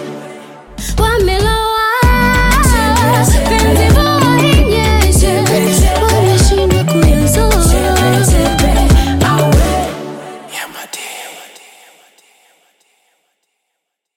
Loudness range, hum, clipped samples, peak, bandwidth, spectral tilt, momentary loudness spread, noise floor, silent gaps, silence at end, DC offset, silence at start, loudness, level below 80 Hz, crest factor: 16 LU; none; under 0.1%; 0 dBFS; 17 kHz; -5 dB/octave; 15 LU; -74 dBFS; none; 2.7 s; under 0.1%; 0 s; -11 LUFS; -16 dBFS; 12 dB